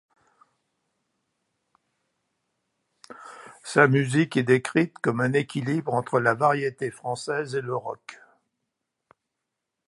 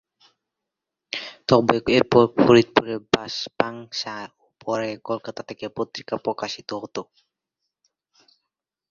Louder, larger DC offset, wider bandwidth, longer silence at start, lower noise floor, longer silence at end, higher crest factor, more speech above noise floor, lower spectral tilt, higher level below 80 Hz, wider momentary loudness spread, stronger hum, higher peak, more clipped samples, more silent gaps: about the same, -24 LUFS vs -22 LUFS; neither; first, 11.5 kHz vs 7.4 kHz; first, 3.1 s vs 1.15 s; about the same, -83 dBFS vs -85 dBFS; about the same, 1.75 s vs 1.85 s; about the same, 24 dB vs 22 dB; second, 59 dB vs 63 dB; about the same, -6 dB/octave vs -5.5 dB/octave; second, -72 dBFS vs -58 dBFS; first, 21 LU vs 17 LU; neither; about the same, -2 dBFS vs -2 dBFS; neither; neither